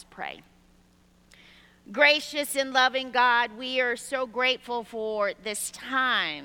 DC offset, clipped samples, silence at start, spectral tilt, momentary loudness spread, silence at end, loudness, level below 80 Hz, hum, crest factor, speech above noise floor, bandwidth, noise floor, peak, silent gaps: under 0.1%; under 0.1%; 0.15 s; -1 dB/octave; 12 LU; 0 s; -25 LUFS; -66 dBFS; none; 22 dB; 34 dB; 19 kHz; -60 dBFS; -6 dBFS; none